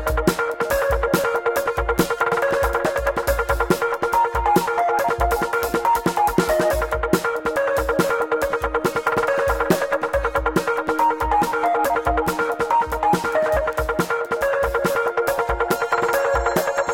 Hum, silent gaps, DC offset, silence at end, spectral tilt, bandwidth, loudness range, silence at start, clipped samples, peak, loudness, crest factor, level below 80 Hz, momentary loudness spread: none; none; under 0.1%; 0 s; -5 dB/octave; 17 kHz; 1 LU; 0 s; under 0.1%; -2 dBFS; -20 LUFS; 18 dB; -34 dBFS; 3 LU